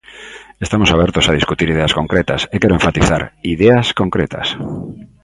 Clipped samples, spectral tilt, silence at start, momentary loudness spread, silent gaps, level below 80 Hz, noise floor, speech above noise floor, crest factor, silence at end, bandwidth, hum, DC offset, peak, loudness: under 0.1%; -5 dB/octave; 0.1 s; 15 LU; none; -30 dBFS; -36 dBFS; 22 dB; 16 dB; 0.2 s; 11.5 kHz; none; under 0.1%; 0 dBFS; -14 LUFS